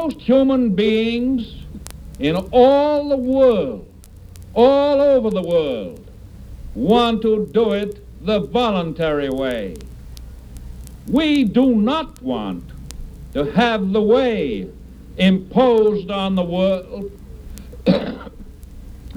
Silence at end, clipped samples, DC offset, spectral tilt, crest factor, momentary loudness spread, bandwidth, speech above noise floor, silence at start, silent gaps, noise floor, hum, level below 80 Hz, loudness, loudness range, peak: 0 s; under 0.1%; under 0.1%; -7 dB/octave; 18 dB; 22 LU; 14.5 kHz; 22 dB; 0 s; none; -39 dBFS; none; -38 dBFS; -18 LUFS; 4 LU; 0 dBFS